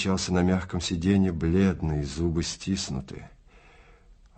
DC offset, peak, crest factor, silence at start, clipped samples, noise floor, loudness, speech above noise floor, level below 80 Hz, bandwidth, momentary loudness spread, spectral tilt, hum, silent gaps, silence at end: under 0.1%; -10 dBFS; 18 dB; 0 s; under 0.1%; -54 dBFS; -26 LUFS; 28 dB; -44 dBFS; 8.8 kHz; 9 LU; -5.5 dB/octave; none; none; 0.25 s